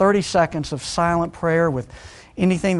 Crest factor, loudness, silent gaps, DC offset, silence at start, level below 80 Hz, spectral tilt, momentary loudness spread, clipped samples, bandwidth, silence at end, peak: 16 dB; -21 LUFS; none; under 0.1%; 0 s; -44 dBFS; -6 dB/octave; 17 LU; under 0.1%; 11.5 kHz; 0 s; -4 dBFS